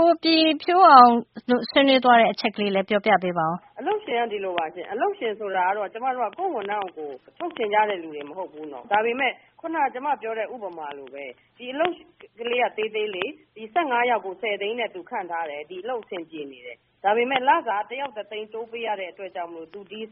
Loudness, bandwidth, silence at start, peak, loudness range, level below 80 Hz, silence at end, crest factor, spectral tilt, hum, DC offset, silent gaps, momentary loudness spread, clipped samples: -22 LUFS; 5.2 kHz; 0 s; 0 dBFS; 10 LU; -72 dBFS; 0.05 s; 24 dB; -1.5 dB/octave; none; under 0.1%; none; 18 LU; under 0.1%